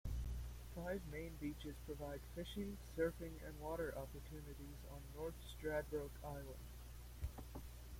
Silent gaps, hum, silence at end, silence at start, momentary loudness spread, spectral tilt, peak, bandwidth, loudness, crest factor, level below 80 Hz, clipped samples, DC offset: none; none; 0 s; 0.05 s; 11 LU; -6 dB/octave; -28 dBFS; 16.5 kHz; -49 LUFS; 20 dB; -54 dBFS; under 0.1%; under 0.1%